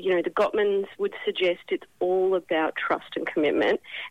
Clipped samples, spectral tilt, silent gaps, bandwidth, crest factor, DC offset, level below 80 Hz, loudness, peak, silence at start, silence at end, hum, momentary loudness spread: under 0.1%; -5.5 dB/octave; none; 8.6 kHz; 12 dB; under 0.1%; -66 dBFS; -26 LUFS; -14 dBFS; 0 s; 0 s; none; 7 LU